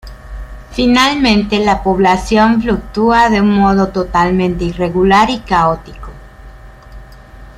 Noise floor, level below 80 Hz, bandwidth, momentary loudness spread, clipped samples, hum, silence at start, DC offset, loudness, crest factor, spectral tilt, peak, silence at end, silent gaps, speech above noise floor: -35 dBFS; -30 dBFS; 13 kHz; 16 LU; under 0.1%; none; 0.05 s; under 0.1%; -12 LUFS; 12 dB; -5.5 dB/octave; 0 dBFS; 0.05 s; none; 23 dB